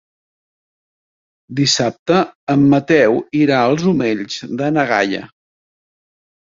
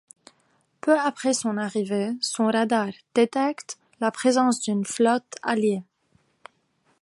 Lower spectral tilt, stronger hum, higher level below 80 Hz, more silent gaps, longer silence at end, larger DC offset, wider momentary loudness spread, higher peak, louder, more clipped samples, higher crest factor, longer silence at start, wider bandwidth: about the same, -5 dB/octave vs -4 dB/octave; neither; first, -56 dBFS vs -76 dBFS; first, 1.99-2.06 s, 2.35-2.47 s vs none; about the same, 1.2 s vs 1.2 s; neither; about the same, 8 LU vs 6 LU; first, -2 dBFS vs -6 dBFS; first, -15 LUFS vs -24 LUFS; neither; about the same, 16 dB vs 18 dB; first, 1.5 s vs 0.85 s; second, 7.8 kHz vs 11.5 kHz